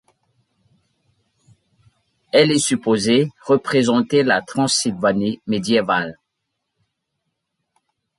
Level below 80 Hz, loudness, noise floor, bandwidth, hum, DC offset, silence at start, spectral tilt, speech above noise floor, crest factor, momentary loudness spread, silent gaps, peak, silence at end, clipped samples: -60 dBFS; -18 LUFS; -77 dBFS; 11.5 kHz; none; under 0.1%; 2.35 s; -4 dB/octave; 59 dB; 18 dB; 6 LU; none; -2 dBFS; 2.05 s; under 0.1%